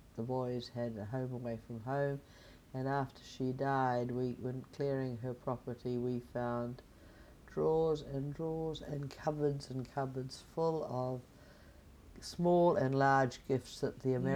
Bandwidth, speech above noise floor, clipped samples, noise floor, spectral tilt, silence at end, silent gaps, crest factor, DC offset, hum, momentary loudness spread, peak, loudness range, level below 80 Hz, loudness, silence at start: 15.5 kHz; 22 dB; under 0.1%; -58 dBFS; -7 dB/octave; 0 s; none; 20 dB; under 0.1%; none; 12 LU; -18 dBFS; 6 LU; -62 dBFS; -37 LUFS; 0 s